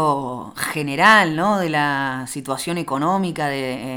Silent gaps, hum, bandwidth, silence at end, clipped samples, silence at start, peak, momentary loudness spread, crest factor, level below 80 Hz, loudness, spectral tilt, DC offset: none; none; 19.5 kHz; 0 s; under 0.1%; 0 s; 0 dBFS; 13 LU; 20 dB; -56 dBFS; -19 LUFS; -4.5 dB/octave; under 0.1%